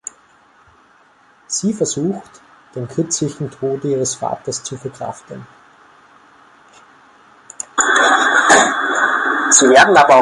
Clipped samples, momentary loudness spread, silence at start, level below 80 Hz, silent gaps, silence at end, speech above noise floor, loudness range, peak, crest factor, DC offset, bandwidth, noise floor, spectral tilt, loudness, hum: under 0.1%; 21 LU; 1.5 s; -58 dBFS; none; 0 s; 36 dB; 16 LU; 0 dBFS; 16 dB; under 0.1%; 11.5 kHz; -51 dBFS; -2.5 dB/octave; -14 LUFS; none